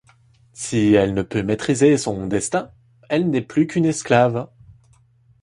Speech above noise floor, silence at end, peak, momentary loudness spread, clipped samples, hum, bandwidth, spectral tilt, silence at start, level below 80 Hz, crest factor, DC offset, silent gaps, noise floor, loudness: 37 dB; 1 s; -2 dBFS; 10 LU; under 0.1%; none; 11.5 kHz; -5.5 dB/octave; 0.55 s; -50 dBFS; 18 dB; under 0.1%; none; -56 dBFS; -19 LUFS